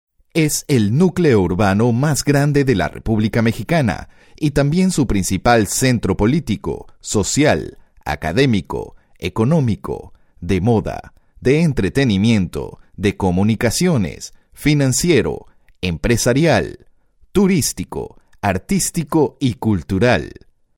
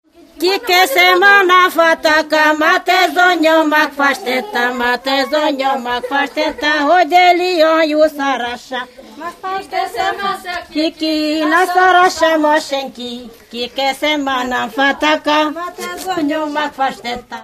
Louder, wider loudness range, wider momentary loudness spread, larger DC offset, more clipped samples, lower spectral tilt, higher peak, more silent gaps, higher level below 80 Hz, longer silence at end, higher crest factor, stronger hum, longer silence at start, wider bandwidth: second, -17 LUFS vs -13 LUFS; second, 3 LU vs 6 LU; about the same, 13 LU vs 14 LU; neither; neither; first, -5.5 dB/octave vs -2 dB/octave; about the same, 0 dBFS vs 0 dBFS; neither; first, -36 dBFS vs -52 dBFS; first, 0.5 s vs 0 s; about the same, 16 dB vs 14 dB; neither; about the same, 0.35 s vs 0.35 s; first, 17 kHz vs 15 kHz